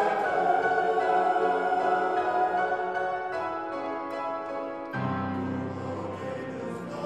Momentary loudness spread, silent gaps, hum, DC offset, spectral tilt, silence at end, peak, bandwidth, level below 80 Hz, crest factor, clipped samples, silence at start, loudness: 10 LU; none; none; under 0.1%; -6.5 dB/octave; 0 s; -12 dBFS; 10 kHz; -70 dBFS; 16 dB; under 0.1%; 0 s; -28 LUFS